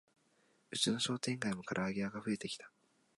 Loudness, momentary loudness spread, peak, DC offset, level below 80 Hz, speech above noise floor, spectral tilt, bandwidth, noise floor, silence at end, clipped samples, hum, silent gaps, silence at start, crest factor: -38 LUFS; 10 LU; -20 dBFS; under 0.1%; -74 dBFS; 36 dB; -3.5 dB/octave; 11.5 kHz; -74 dBFS; 0.5 s; under 0.1%; none; none; 0.7 s; 20 dB